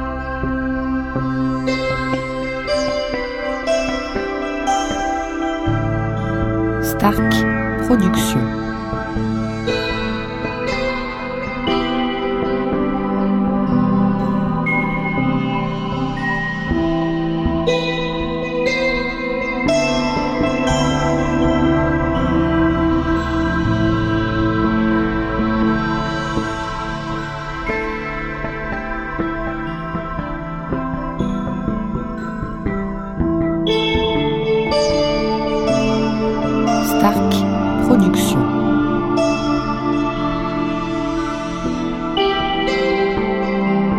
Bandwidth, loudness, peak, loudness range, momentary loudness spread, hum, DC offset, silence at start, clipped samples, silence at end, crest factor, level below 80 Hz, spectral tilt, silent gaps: 16 kHz; -19 LUFS; 0 dBFS; 7 LU; 8 LU; none; under 0.1%; 0 s; under 0.1%; 0 s; 18 dB; -32 dBFS; -6 dB/octave; none